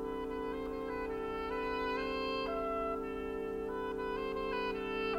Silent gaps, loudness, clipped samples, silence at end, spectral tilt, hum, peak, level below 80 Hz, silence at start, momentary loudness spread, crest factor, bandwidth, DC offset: none; -38 LUFS; under 0.1%; 0 s; -6 dB/octave; none; -26 dBFS; -54 dBFS; 0 s; 3 LU; 12 dB; 16 kHz; under 0.1%